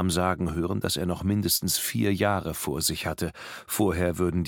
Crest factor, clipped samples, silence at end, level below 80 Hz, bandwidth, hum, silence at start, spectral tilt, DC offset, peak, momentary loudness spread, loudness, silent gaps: 18 dB; under 0.1%; 0 s; -46 dBFS; 17.5 kHz; none; 0 s; -4.5 dB/octave; under 0.1%; -8 dBFS; 7 LU; -26 LUFS; none